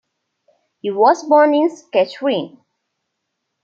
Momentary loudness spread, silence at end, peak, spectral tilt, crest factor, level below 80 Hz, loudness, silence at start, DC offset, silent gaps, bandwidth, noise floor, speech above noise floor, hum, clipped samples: 13 LU; 1.15 s; -2 dBFS; -5 dB/octave; 16 dB; -74 dBFS; -16 LUFS; 0.85 s; under 0.1%; none; 7.6 kHz; -75 dBFS; 60 dB; none; under 0.1%